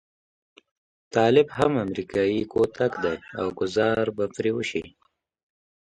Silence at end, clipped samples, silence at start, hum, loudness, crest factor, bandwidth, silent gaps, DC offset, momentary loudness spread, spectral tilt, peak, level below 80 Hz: 1.05 s; under 0.1%; 1.15 s; none; -24 LUFS; 20 dB; 9.4 kHz; none; under 0.1%; 9 LU; -6 dB/octave; -6 dBFS; -56 dBFS